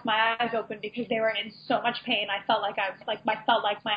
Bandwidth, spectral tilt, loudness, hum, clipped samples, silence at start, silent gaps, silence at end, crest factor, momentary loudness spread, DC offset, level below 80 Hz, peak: 5.2 kHz; -6.5 dB/octave; -27 LUFS; none; under 0.1%; 0 s; none; 0 s; 18 dB; 7 LU; under 0.1%; -72 dBFS; -10 dBFS